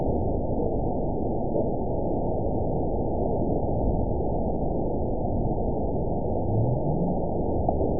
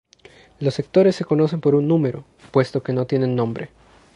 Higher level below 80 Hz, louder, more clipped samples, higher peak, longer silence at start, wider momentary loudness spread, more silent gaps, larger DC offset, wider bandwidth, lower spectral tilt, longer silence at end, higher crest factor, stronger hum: first, -34 dBFS vs -58 dBFS; second, -27 LUFS vs -20 LUFS; neither; second, -10 dBFS vs -4 dBFS; second, 0 s vs 0.6 s; second, 2 LU vs 9 LU; neither; first, 3% vs under 0.1%; second, 1 kHz vs 10.5 kHz; first, -19 dB/octave vs -8 dB/octave; second, 0 s vs 0.5 s; about the same, 16 dB vs 18 dB; neither